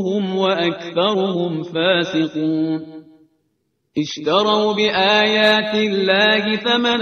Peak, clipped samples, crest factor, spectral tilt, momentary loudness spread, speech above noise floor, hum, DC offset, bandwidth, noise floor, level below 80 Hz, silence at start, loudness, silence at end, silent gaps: 0 dBFS; under 0.1%; 18 dB; -5 dB/octave; 9 LU; 52 dB; none; under 0.1%; 8 kHz; -69 dBFS; -62 dBFS; 0 s; -17 LUFS; 0 s; none